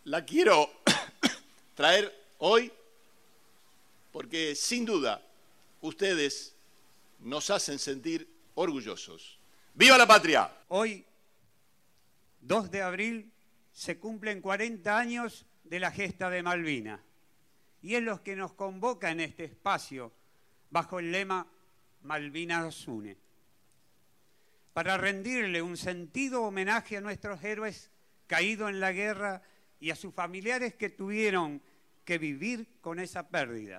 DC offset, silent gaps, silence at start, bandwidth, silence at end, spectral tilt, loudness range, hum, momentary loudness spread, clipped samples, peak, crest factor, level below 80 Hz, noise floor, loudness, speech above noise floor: under 0.1%; none; 0.05 s; 14.5 kHz; 0 s; -3 dB/octave; 12 LU; none; 17 LU; under 0.1%; -8 dBFS; 24 dB; -72 dBFS; -71 dBFS; -29 LUFS; 41 dB